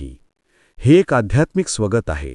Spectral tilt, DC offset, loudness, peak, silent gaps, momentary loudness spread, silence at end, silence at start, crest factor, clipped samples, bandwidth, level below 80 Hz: -6 dB/octave; under 0.1%; -17 LUFS; -2 dBFS; none; 8 LU; 0 s; 0 s; 16 dB; under 0.1%; 11 kHz; -36 dBFS